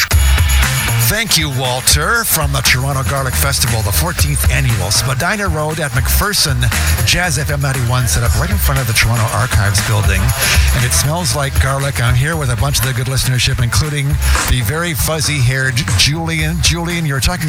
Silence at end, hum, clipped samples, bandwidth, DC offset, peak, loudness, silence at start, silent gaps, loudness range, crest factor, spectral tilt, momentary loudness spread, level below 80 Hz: 0 s; none; under 0.1%; over 20 kHz; under 0.1%; 0 dBFS; -13 LUFS; 0 s; none; 2 LU; 14 dB; -3.5 dB/octave; 4 LU; -20 dBFS